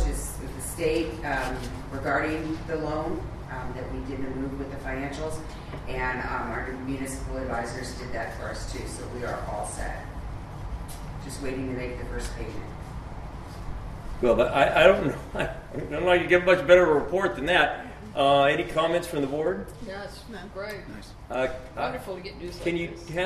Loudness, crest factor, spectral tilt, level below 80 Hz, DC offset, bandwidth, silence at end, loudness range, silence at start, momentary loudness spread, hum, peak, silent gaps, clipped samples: -27 LUFS; 24 dB; -5 dB/octave; -40 dBFS; under 0.1%; 13.5 kHz; 0 s; 13 LU; 0 s; 18 LU; none; -4 dBFS; none; under 0.1%